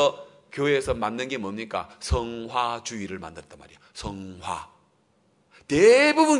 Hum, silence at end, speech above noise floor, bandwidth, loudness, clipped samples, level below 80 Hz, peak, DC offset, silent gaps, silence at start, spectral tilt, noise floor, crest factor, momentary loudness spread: none; 0 s; 41 dB; 11 kHz; -24 LUFS; under 0.1%; -44 dBFS; -6 dBFS; under 0.1%; none; 0 s; -4.5 dB/octave; -65 dBFS; 20 dB; 21 LU